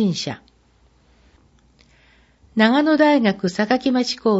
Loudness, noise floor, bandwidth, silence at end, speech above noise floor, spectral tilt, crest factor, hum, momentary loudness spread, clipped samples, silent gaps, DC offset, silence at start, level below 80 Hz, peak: -18 LUFS; -57 dBFS; 8 kHz; 0 s; 39 dB; -5.5 dB/octave; 18 dB; none; 13 LU; under 0.1%; none; under 0.1%; 0 s; -58 dBFS; -2 dBFS